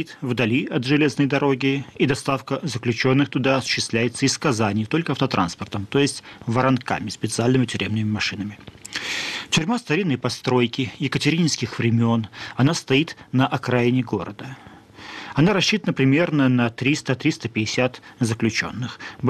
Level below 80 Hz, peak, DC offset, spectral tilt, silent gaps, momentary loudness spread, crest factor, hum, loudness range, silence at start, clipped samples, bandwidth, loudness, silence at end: -56 dBFS; -8 dBFS; under 0.1%; -5 dB/octave; none; 9 LU; 14 dB; none; 2 LU; 0 s; under 0.1%; 13.5 kHz; -22 LUFS; 0 s